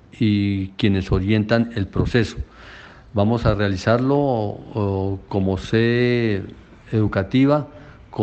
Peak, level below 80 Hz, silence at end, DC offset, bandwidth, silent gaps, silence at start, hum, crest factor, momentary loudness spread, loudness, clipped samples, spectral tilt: -2 dBFS; -38 dBFS; 0 s; under 0.1%; 8.2 kHz; none; 0.2 s; none; 18 dB; 10 LU; -20 LUFS; under 0.1%; -8 dB/octave